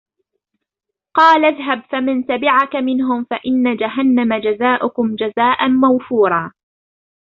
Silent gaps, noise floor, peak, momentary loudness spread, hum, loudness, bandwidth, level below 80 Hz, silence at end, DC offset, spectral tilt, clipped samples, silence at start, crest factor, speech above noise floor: none; -82 dBFS; -2 dBFS; 7 LU; none; -15 LUFS; 6.2 kHz; -60 dBFS; 0.9 s; under 0.1%; -6.5 dB/octave; under 0.1%; 1.15 s; 14 dB; 67 dB